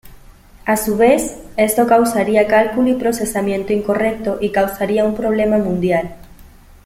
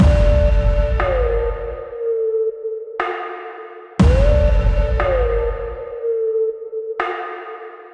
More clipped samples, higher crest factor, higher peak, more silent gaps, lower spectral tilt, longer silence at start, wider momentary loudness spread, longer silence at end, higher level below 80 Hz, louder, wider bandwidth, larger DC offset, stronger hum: neither; about the same, 14 dB vs 12 dB; about the same, -2 dBFS vs -4 dBFS; neither; second, -5 dB/octave vs -8 dB/octave; about the same, 0.05 s vs 0 s; second, 6 LU vs 14 LU; first, 0.4 s vs 0.05 s; second, -42 dBFS vs -20 dBFS; first, -16 LUFS vs -20 LUFS; first, 16.5 kHz vs 8.4 kHz; neither; neither